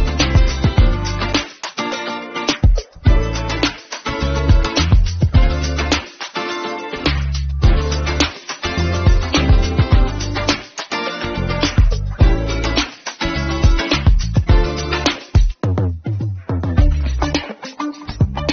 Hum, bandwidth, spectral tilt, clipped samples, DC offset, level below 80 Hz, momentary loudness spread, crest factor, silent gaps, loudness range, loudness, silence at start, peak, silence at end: none; 7.2 kHz; -5 dB/octave; under 0.1%; under 0.1%; -18 dBFS; 8 LU; 16 dB; none; 2 LU; -18 LUFS; 0 s; 0 dBFS; 0 s